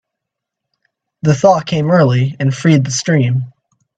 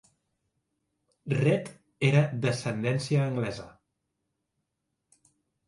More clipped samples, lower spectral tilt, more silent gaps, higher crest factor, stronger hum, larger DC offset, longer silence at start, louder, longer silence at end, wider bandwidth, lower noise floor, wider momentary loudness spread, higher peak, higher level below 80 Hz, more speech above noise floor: neither; about the same, -6 dB/octave vs -6.5 dB/octave; neither; second, 14 dB vs 22 dB; neither; neither; about the same, 1.25 s vs 1.25 s; first, -13 LUFS vs -28 LUFS; second, 0.5 s vs 1.95 s; second, 9.2 kHz vs 11.5 kHz; about the same, -80 dBFS vs -82 dBFS; second, 7 LU vs 14 LU; first, 0 dBFS vs -10 dBFS; first, -54 dBFS vs -66 dBFS; first, 67 dB vs 55 dB